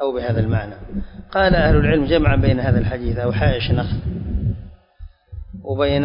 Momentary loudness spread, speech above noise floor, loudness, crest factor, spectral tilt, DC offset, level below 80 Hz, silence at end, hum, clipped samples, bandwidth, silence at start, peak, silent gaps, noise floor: 16 LU; 23 dB; -19 LUFS; 14 dB; -12 dB/octave; under 0.1%; -26 dBFS; 0 s; none; under 0.1%; 5.4 kHz; 0 s; -4 dBFS; none; -40 dBFS